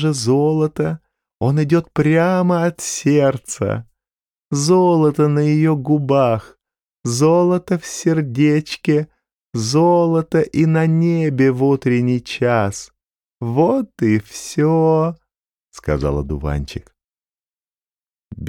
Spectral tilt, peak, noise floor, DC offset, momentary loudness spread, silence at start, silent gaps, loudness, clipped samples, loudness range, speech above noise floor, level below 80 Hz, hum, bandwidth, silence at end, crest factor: -6.5 dB/octave; -4 dBFS; under -90 dBFS; under 0.1%; 10 LU; 0 s; 9.41-9.45 s; -17 LUFS; under 0.1%; 4 LU; over 74 dB; -40 dBFS; none; 15 kHz; 0 s; 14 dB